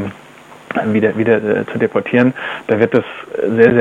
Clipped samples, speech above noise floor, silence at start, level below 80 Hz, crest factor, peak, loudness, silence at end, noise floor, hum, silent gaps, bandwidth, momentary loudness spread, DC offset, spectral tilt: under 0.1%; 25 dB; 0 s; -56 dBFS; 16 dB; 0 dBFS; -15 LUFS; 0 s; -39 dBFS; none; none; 9.2 kHz; 10 LU; under 0.1%; -8 dB/octave